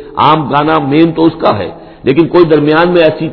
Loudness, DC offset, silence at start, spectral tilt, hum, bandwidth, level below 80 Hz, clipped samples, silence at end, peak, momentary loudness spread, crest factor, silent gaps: -9 LUFS; under 0.1%; 0 s; -9.5 dB/octave; none; 5.4 kHz; -40 dBFS; 1%; 0 s; 0 dBFS; 6 LU; 10 dB; none